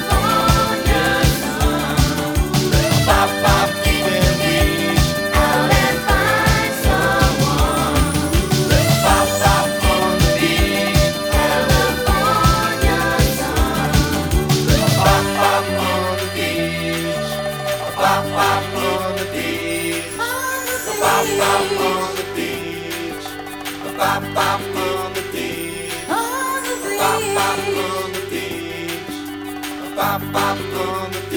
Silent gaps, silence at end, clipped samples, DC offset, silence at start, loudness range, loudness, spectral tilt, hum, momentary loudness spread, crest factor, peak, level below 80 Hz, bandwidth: none; 0 s; under 0.1%; under 0.1%; 0 s; 6 LU; -17 LUFS; -4.5 dB/octave; none; 10 LU; 18 dB; 0 dBFS; -26 dBFS; over 20 kHz